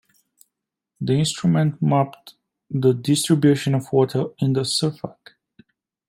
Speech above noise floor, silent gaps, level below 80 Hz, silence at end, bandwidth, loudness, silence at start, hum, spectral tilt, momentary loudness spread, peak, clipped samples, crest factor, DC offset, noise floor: 62 dB; none; -62 dBFS; 0.95 s; 16 kHz; -20 LUFS; 1 s; none; -6 dB/octave; 10 LU; -6 dBFS; under 0.1%; 16 dB; under 0.1%; -82 dBFS